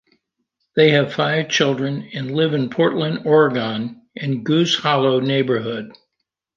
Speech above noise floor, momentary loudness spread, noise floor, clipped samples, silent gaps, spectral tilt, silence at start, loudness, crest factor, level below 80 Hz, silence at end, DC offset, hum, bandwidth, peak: 60 dB; 12 LU; -78 dBFS; under 0.1%; none; -5.5 dB/octave; 0.75 s; -18 LUFS; 18 dB; -64 dBFS; 0.65 s; under 0.1%; none; 7.4 kHz; -2 dBFS